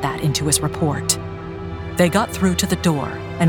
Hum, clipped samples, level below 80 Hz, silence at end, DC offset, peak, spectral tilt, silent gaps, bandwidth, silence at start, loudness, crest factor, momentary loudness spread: none; under 0.1%; -38 dBFS; 0 s; under 0.1%; -2 dBFS; -4.5 dB/octave; none; 19.5 kHz; 0 s; -20 LUFS; 18 dB; 12 LU